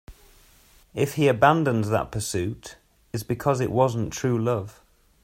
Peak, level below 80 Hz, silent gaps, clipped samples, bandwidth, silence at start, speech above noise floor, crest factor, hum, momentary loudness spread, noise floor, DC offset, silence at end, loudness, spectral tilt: -4 dBFS; -52 dBFS; none; under 0.1%; 16 kHz; 0.1 s; 32 dB; 20 dB; none; 17 LU; -56 dBFS; under 0.1%; 0.55 s; -24 LUFS; -6 dB/octave